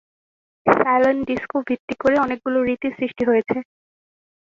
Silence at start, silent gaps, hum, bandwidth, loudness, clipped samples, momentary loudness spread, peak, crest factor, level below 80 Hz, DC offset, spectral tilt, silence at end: 0.65 s; 1.80-1.88 s; none; 7.2 kHz; -20 LUFS; under 0.1%; 8 LU; -2 dBFS; 20 dB; -56 dBFS; under 0.1%; -7 dB/octave; 0.8 s